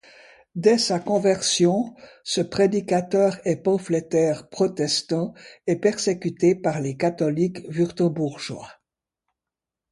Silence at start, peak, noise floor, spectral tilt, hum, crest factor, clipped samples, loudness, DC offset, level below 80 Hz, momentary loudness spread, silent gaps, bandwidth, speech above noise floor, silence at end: 0.55 s; -4 dBFS; -88 dBFS; -5 dB/octave; none; 18 dB; under 0.1%; -23 LUFS; under 0.1%; -62 dBFS; 8 LU; none; 11.5 kHz; 66 dB; 1.2 s